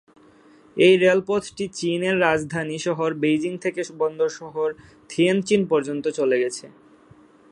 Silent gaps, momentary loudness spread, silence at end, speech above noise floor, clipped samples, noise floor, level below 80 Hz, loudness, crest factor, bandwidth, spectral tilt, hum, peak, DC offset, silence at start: none; 10 LU; 0.8 s; 31 dB; under 0.1%; -52 dBFS; -62 dBFS; -22 LUFS; 20 dB; 11 kHz; -5 dB/octave; none; -4 dBFS; under 0.1%; 0.75 s